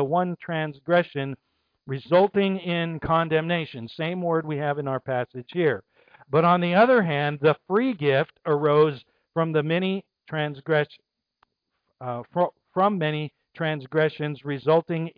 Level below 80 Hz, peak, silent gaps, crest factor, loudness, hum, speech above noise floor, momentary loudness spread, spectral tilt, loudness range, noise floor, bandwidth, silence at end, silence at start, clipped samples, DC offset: -62 dBFS; -8 dBFS; none; 16 dB; -24 LUFS; none; 53 dB; 12 LU; -9.5 dB/octave; 6 LU; -77 dBFS; 5.2 kHz; 0.1 s; 0 s; under 0.1%; under 0.1%